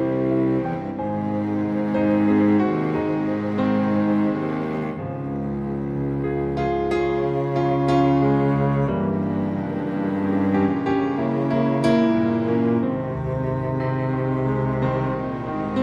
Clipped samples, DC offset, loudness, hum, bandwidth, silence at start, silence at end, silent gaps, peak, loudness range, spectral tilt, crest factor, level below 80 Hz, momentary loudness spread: under 0.1%; under 0.1%; -22 LUFS; none; 10 kHz; 0 s; 0 s; none; -6 dBFS; 3 LU; -9 dB/octave; 14 dB; -44 dBFS; 8 LU